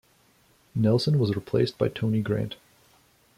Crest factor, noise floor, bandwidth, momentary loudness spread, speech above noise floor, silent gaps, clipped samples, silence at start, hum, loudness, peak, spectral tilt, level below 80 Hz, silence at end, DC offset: 16 dB; -62 dBFS; 14.5 kHz; 12 LU; 38 dB; none; under 0.1%; 0.75 s; none; -26 LUFS; -10 dBFS; -7.5 dB/octave; -58 dBFS; 0.85 s; under 0.1%